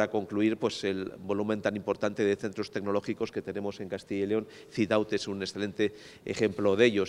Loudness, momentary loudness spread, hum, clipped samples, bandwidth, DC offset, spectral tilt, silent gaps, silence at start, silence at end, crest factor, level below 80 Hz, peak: -31 LUFS; 8 LU; none; under 0.1%; 12 kHz; under 0.1%; -5.5 dB/octave; none; 0 s; 0 s; 20 dB; -66 dBFS; -10 dBFS